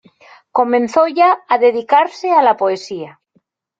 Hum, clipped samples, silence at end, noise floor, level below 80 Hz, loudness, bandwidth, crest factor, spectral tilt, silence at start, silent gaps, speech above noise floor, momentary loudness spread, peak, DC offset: none; under 0.1%; 0.7 s; -61 dBFS; -66 dBFS; -14 LUFS; 7.8 kHz; 14 dB; -4.5 dB/octave; 0.55 s; none; 47 dB; 12 LU; 0 dBFS; under 0.1%